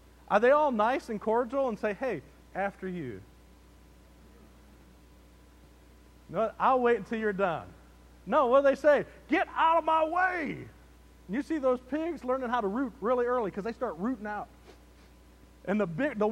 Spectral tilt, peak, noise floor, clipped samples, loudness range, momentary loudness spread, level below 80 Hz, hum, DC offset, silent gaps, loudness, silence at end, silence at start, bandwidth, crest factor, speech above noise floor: -6.5 dB/octave; -10 dBFS; -56 dBFS; under 0.1%; 13 LU; 15 LU; -58 dBFS; none; under 0.1%; none; -29 LUFS; 0 s; 0.3 s; 13 kHz; 20 dB; 27 dB